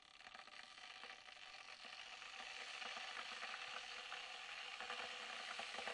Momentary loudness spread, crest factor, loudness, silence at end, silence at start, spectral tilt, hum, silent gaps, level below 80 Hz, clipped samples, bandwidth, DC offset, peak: 8 LU; 18 dB; -50 LUFS; 0 s; 0 s; 0.5 dB/octave; none; none; -86 dBFS; under 0.1%; 12 kHz; under 0.1%; -34 dBFS